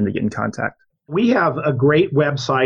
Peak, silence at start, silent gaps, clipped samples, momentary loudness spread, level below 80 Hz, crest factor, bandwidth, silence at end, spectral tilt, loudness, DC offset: -4 dBFS; 0 s; none; under 0.1%; 10 LU; -54 dBFS; 14 dB; 9.2 kHz; 0 s; -7 dB/octave; -18 LUFS; under 0.1%